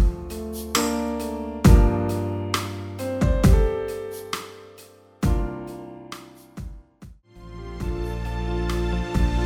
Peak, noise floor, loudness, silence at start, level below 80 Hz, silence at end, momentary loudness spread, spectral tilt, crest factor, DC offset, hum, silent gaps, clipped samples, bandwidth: -2 dBFS; -49 dBFS; -24 LUFS; 0 s; -26 dBFS; 0 s; 21 LU; -6 dB/octave; 20 dB; under 0.1%; none; none; under 0.1%; 16.5 kHz